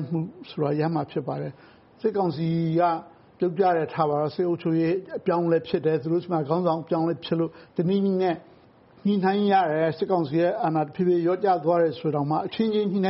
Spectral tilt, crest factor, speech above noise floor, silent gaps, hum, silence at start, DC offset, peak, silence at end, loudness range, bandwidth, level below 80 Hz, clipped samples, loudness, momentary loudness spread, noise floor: -6.5 dB/octave; 16 dB; 30 dB; none; none; 0 s; under 0.1%; -8 dBFS; 0 s; 3 LU; 5.8 kHz; -66 dBFS; under 0.1%; -25 LUFS; 7 LU; -54 dBFS